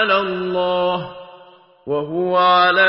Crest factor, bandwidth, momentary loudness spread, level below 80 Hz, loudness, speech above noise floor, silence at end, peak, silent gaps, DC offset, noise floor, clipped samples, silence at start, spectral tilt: 14 dB; 5.8 kHz; 20 LU; -58 dBFS; -18 LUFS; 30 dB; 0 s; -4 dBFS; none; under 0.1%; -46 dBFS; under 0.1%; 0 s; -9.5 dB/octave